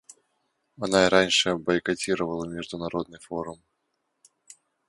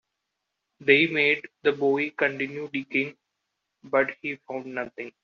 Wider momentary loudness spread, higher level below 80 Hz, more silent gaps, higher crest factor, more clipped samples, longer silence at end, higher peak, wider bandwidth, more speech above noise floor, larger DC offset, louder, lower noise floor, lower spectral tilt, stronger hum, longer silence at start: about the same, 15 LU vs 14 LU; first, -58 dBFS vs -72 dBFS; neither; about the same, 26 dB vs 22 dB; neither; first, 1.35 s vs 0.15 s; about the same, -2 dBFS vs -4 dBFS; first, 11.5 kHz vs 6.8 kHz; second, 52 dB vs 56 dB; neither; about the same, -25 LUFS vs -25 LUFS; second, -77 dBFS vs -82 dBFS; about the same, -3.5 dB/octave vs -2.5 dB/octave; neither; about the same, 0.8 s vs 0.8 s